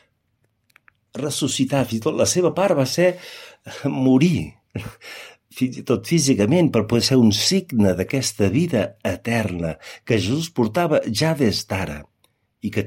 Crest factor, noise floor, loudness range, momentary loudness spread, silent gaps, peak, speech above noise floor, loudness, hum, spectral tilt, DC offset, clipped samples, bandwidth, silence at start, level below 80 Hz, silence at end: 16 dB; -68 dBFS; 4 LU; 17 LU; none; -4 dBFS; 49 dB; -20 LUFS; none; -5 dB/octave; under 0.1%; under 0.1%; 16.5 kHz; 1.15 s; -50 dBFS; 0 s